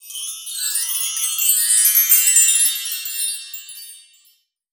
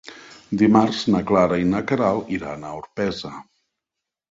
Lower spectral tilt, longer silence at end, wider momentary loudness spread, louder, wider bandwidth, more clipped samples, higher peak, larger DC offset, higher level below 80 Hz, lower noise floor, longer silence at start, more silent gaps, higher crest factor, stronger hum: second, 10.5 dB/octave vs -6.5 dB/octave; second, 0.75 s vs 0.9 s; about the same, 18 LU vs 16 LU; first, -14 LUFS vs -20 LUFS; first, over 20 kHz vs 7.8 kHz; neither; about the same, -2 dBFS vs -2 dBFS; neither; second, under -90 dBFS vs -50 dBFS; second, -59 dBFS vs -85 dBFS; about the same, 0.05 s vs 0.05 s; neither; about the same, 18 dB vs 18 dB; neither